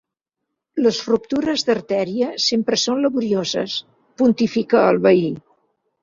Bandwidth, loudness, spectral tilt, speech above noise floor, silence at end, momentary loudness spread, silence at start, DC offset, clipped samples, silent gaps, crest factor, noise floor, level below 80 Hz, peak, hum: 7.4 kHz; -19 LUFS; -4.5 dB/octave; 62 dB; 0.65 s; 8 LU; 0.75 s; under 0.1%; under 0.1%; none; 16 dB; -81 dBFS; -60 dBFS; -2 dBFS; none